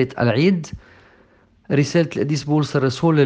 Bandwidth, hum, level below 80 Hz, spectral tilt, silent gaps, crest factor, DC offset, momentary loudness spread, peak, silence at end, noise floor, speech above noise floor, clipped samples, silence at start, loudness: 9.2 kHz; none; -52 dBFS; -6.5 dB/octave; none; 16 dB; under 0.1%; 7 LU; -4 dBFS; 0 s; -54 dBFS; 36 dB; under 0.1%; 0 s; -19 LUFS